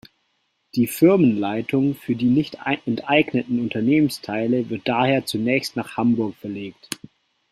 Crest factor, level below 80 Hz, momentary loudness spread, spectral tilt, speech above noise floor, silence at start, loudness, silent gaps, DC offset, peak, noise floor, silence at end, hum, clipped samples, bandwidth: 18 dB; -60 dBFS; 13 LU; -6 dB/octave; 49 dB; 0.75 s; -21 LUFS; none; under 0.1%; -2 dBFS; -70 dBFS; 0.55 s; none; under 0.1%; 16 kHz